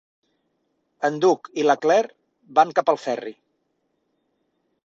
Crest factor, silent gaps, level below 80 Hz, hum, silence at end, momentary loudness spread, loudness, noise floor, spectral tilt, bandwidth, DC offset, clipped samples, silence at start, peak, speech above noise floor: 20 dB; none; -74 dBFS; none; 1.55 s; 11 LU; -21 LUFS; -72 dBFS; -4.5 dB/octave; 7.8 kHz; under 0.1%; under 0.1%; 1 s; -2 dBFS; 52 dB